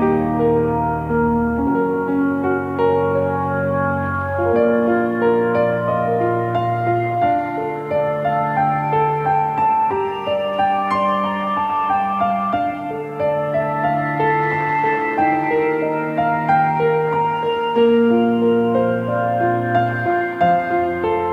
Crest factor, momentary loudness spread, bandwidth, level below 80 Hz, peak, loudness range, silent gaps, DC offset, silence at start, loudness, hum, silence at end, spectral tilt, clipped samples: 14 dB; 4 LU; 6.8 kHz; -46 dBFS; -4 dBFS; 2 LU; none; under 0.1%; 0 s; -18 LUFS; none; 0 s; -8.5 dB/octave; under 0.1%